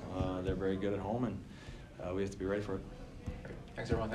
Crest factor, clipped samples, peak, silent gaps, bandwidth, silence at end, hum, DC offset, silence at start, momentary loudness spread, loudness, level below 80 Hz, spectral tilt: 18 dB; under 0.1%; -20 dBFS; none; 12 kHz; 0 s; none; under 0.1%; 0 s; 13 LU; -39 LUFS; -50 dBFS; -7.5 dB/octave